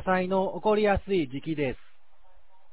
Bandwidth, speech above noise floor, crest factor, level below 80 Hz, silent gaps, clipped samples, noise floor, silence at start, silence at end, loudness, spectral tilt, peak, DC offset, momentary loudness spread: 4 kHz; 35 dB; 16 dB; -48 dBFS; none; under 0.1%; -62 dBFS; 0 s; 0.95 s; -27 LUFS; -10.5 dB/octave; -12 dBFS; 0.8%; 8 LU